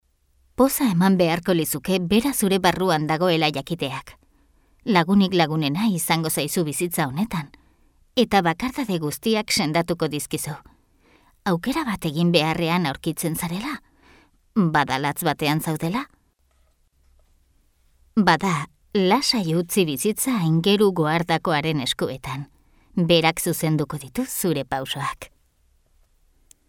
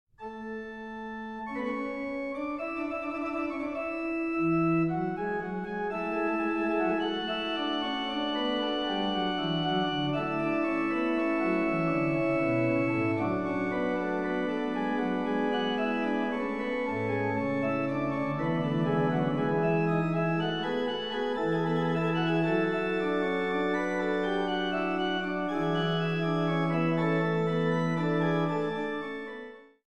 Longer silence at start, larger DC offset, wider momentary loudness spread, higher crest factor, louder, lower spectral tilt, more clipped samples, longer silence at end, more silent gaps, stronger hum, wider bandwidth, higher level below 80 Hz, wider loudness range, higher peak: first, 0.6 s vs 0.2 s; second, under 0.1% vs 0.2%; first, 10 LU vs 6 LU; first, 20 dB vs 14 dB; first, -22 LUFS vs -29 LUFS; second, -4.5 dB/octave vs -7.5 dB/octave; neither; first, 1.45 s vs 0.05 s; neither; neither; first, 18.5 kHz vs 8.8 kHz; first, -52 dBFS vs -62 dBFS; about the same, 5 LU vs 3 LU; first, -4 dBFS vs -14 dBFS